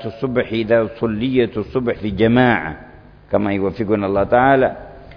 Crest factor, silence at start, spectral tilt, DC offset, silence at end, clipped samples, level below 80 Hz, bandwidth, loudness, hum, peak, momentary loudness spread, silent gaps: 16 dB; 0 s; -9.5 dB/octave; under 0.1%; 0 s; under 0.1%; -42 dBFS; 5.4 kHz; -18 LUFS; none; -2 dBFS; 8 LU; none